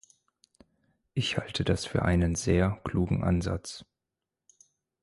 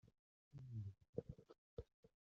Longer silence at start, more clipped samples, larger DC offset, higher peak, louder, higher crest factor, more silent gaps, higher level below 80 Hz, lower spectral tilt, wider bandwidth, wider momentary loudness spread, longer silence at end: first, 1.15 s vs 0.05 s; neither; neither; first, -12 dBFS vs -30 dBFS; first, -29 LUFS vs -56 LUFS; second, 20 dB vs 26 dB; second, none vs 0.19-0.51 s, 1.09-1.13 s, 1.58-1.77 s, 1.94-2.03 s; first, -42 dBFS vs -72 dBFS; second, -5.5 dB/octave vs -10.5 dB/octave; first, 11.5 kHz vs 7 kHz; about the same, 10 LU vs 11 LU; first, 1.2 s vs 0.2 s